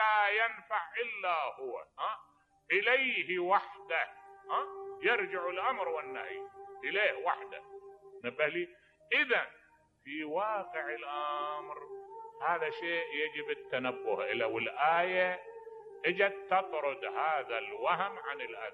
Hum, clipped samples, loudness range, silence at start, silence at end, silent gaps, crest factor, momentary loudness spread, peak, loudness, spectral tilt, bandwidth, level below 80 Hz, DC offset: none; under 0.1%; 4 LU; 0 s; 0 s; none; 20 dB; 15 LU; -14 dBFS; -33 LUFS; -5.5 dB/octave; 7.4 kHz; -82 dBFS; under 0.1%